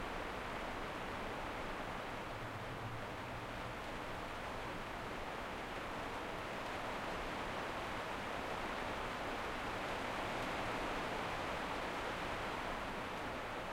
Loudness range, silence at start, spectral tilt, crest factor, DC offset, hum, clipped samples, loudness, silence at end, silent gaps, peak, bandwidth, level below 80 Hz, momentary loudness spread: 4 LU; 0 s; -4.5 dB/octave; 14 dB; under 0.1%; none; under 0.1%; -43 LUFS; 0 s; none; -30 dBFS; 16.5 kHz; -56 dBFS; 4 LU